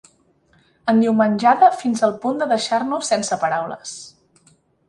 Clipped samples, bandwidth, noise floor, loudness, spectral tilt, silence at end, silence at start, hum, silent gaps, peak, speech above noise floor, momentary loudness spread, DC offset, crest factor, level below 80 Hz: under 0.1%; 11.5 kHz; -58 dBFS; -18 LUFS; -4.5 dB/octave; 0.8 s; 0.85 s; none; none; -2 dBFS; 40 dB; 14 LU; under 0.1%; 18 dB; -64 dBFS